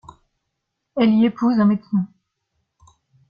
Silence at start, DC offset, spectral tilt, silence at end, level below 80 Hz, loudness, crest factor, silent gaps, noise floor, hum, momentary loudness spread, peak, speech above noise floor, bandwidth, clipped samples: 0.95 s; under 0.1%; -9 dB/octave; 1.25 s; -60 dBFS; -18 LUFS; 16 dB; none; -77 dBFS; none; 12 LU; -6 dBFS; 60 dB; 5.4 kHz; under 0.1%